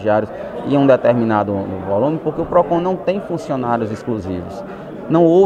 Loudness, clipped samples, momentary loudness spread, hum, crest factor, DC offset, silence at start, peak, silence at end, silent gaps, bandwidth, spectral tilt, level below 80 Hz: -18 LUFS; under 0.1%; 13 LU; none; 16 dB; under 0.1%; 0 s; 0 dBFS; 0 s; none; 9.2 kHz; -8.5 dB/octave; -48 dBFS